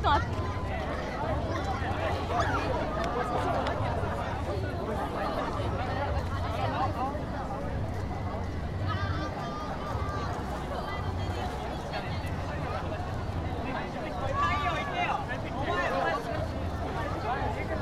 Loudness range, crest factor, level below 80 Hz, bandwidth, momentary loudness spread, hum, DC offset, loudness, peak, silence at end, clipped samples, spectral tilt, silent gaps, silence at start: 3 LU; 20 dB; -40 dBFS; 13.5 kHz; 6 LU; none; under 0.1%; -32 LUFS; -12 dBFS; 0 s; under 0.1%; -6.5 dB/octave; none; 0 s